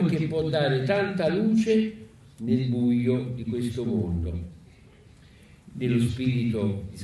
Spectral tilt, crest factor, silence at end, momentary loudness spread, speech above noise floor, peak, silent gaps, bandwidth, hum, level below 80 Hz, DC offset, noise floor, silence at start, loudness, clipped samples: -7.5 dB/octave; 14 dB; 0 s; 10 LU; 27 dB; -12 dBFS; none; 12 kHz; none; -48 dBFS; under 0.1%; -52 dBFS; 0 s; -26 LUFS; under 0.1%